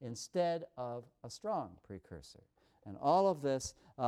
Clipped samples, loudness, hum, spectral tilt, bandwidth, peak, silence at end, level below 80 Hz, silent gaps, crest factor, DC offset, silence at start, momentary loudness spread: under 0.1%; -36 LUFS; none; -5.5 dB/octave; 14.5 kHz; -18 dBFS; 0 s; -68 dBFS; none; 18 dB; under 0.1%; 0 s; 21 LU